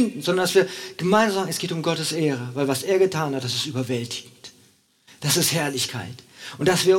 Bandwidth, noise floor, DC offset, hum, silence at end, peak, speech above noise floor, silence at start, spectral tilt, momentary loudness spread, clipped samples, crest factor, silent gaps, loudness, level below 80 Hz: 17.5 kHz; -58 dBFS; under 0.1%; none; 0 s; -4 dBFS; 36 dB; 0 s; -4 dB/octave; 13 LU; under 0.1%; 18 dB; none; -23 LUFS; -64 dBFS